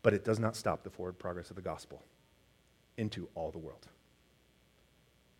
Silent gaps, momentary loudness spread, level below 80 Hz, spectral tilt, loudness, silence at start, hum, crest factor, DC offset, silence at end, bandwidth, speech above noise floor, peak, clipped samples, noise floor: none; 19 LU; -64 dBFS; -6 dB/octave; -38 LUFS; 0.05 s; none; 26 dB; under 0.1%; 1.5 s; 16 kHz; 32 dB; -12 dBFS; under 0.1%; -68 dBFS